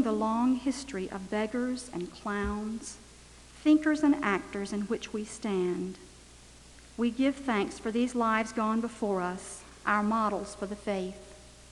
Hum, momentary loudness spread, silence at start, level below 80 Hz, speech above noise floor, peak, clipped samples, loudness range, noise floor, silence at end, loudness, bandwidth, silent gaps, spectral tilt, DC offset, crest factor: none; 14 LU; 0 s; -54 dBFS; 23 dB; -12 dBFS; under 0.1%; 3 LU; -53 dBFS; 0 s; -31 LUFS; 12 kHz; none; -5 dB/octave; under 0.1%; 18 dB